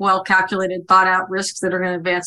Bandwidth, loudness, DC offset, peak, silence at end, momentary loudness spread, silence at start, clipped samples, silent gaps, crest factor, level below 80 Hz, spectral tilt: 12.5 kHz; -17 LUFS; under 0.1%; -2 dBFS; 0 s; 8 LU; 0 s; under 0.1%; none; 16 dB; -60 dBFS; -3.5 dB/octave